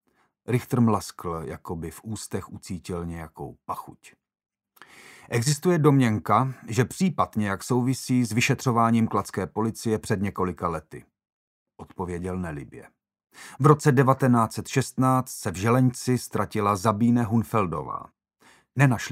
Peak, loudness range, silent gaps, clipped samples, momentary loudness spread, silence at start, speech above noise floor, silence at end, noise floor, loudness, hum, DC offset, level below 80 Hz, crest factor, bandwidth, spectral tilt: -2 dBFS; 12 LU; 11.32-11.66 s; under 0.1%; 15 LU; 0.5 s; 35 dB; 0 s; -59 dBFS; -25 LUFS; none; under 0.1%; -56 dBFS; 22 dB; 16 kHz; -6 dB/octave